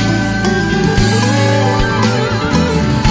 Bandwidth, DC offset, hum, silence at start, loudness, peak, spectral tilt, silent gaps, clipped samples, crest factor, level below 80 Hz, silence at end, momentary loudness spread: 8 kHz; under 0.1%; none; 0 s; -13 LUFS; 0 dBFS; -5.5 dB/octave; none; under 0.1%; 12 dB; -24 dBFS; 0 s; 2 LU